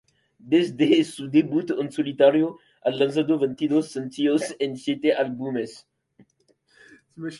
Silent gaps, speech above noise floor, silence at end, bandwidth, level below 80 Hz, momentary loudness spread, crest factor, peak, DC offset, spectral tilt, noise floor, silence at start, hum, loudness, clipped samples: none; 43 dB; 0 s; 11.5 kHz; -70 dBFS; 10 LU; 18 dB; -4 dBFS; under 0.1%; -6 dB/octave; -66 dBFS; 0.45 s; none; -23 LUFS; under 0.1%